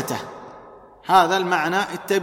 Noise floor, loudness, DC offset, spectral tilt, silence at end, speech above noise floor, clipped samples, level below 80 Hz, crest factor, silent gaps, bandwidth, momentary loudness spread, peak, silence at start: -45 dBFS; -20 LUFS; under 0.1%; -4 dB/octave; 0 s; 26 dB; under 0.1%; -60 dBFS; 18 dB; none; 16.5 kHz; 22 LU; -4 dBFS; 0 s